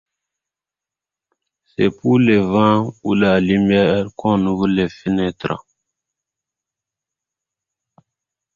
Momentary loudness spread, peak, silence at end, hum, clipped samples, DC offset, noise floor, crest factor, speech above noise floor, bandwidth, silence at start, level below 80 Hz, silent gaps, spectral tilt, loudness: 8 LU; -2 dBFS; 2.95 s; none; under 0.1%; under 0.1%; -88 dBFS; 18 dB; 72 dB; 7.2 kHz; 1.8 s; -48 dBFS; none; -8 dB/octave; -17 LUFS